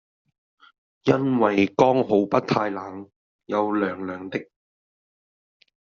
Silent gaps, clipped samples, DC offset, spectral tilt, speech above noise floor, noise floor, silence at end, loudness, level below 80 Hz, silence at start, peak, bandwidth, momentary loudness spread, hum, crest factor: 3.16-3.39 s; under 0.1%; under 0.1%; -5.5 dB/octave; over 68 dB; under -90 dBFS; 1.45 s; -23 LUFS; -64 dBFS; 1.05 s; -4 dBFS; 7.2 kHz; 14 LU; none; 22 dB